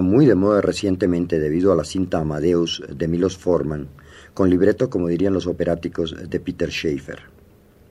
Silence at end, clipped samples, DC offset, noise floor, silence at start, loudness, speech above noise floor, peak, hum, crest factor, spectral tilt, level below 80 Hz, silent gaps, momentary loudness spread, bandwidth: 0.7 s; under 0.1%; under 0.1%; -50 dBFS; 0 s; -20 LUFS; 31 dB; -4 dBFS; none; 16 dB; -6.5 dB/octave; -44 dBFS; none; 11 LU; 12 kHz